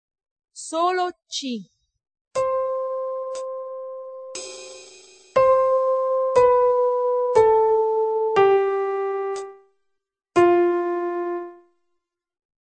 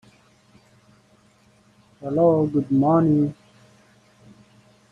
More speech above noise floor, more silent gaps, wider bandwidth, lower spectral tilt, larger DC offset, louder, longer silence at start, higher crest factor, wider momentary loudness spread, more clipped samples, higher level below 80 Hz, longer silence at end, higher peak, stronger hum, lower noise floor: first, 51 dB vs 39 dB; first, 2.21-2.31 s vs none; first, 9 kHz vs 7.2 kHz; second, -4.5 dB/octave vs -10.5 dB/octave; neither; about the same, -21 LUFS vs -20 LUFS; second, 0.55 s vs 2 s; about the same, 18 dB vs 18 dB; first, 17 LU vs 9 LU; neither; about the same, -60 dBFS vs -60 dBFS; second, 1.1 s vs 1.6 s; about the same, -4 dBFS vs -6 dBFS; neither; first, -77 dBFS vs -57 dBFS